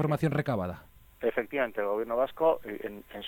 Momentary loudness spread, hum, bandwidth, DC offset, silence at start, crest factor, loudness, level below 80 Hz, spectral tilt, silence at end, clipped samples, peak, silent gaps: 12 LU; none; 17.5 kHz; under 0.1%; 0 s; 16 dB; -31 LUFS; -60 dBFS; -7.5 dB/octave; 0 s; under 0.1%; -14 dBFS; none